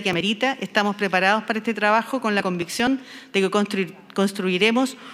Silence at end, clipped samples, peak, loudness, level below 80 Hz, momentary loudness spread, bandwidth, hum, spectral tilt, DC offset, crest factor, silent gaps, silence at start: 0 s; under 0.1%; -2 dBFS; -22 LUFS; -64 dBFS; 6 LU; 15.5 kHz; none; -4.5 dB/octave; under 0.1%; 20 dB; none; 0 s